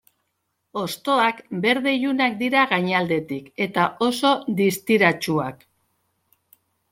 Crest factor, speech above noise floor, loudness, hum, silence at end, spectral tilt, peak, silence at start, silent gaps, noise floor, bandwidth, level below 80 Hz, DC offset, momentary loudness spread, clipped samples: 20 dB; 54 dB; -21 LUFS; none; 1.35 s; -5 dB/octave; -4 dBFS; 0.75 s; none; -75 dBFS; 16.5 kHz; -66 dBFS; under 0.1%; 9 LU; under 0.1%